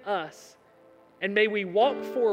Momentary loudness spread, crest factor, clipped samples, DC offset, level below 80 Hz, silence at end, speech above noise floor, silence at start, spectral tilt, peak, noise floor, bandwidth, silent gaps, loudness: 9 LU; 18 dB; under 0.1%; under 0.1%; -82 dBFS; 0 s; 30 dB; 0.05 s; -5 dB/octave; -10 dBFS; -57 dBFS; 15.5 kHz; none; -26 LUFS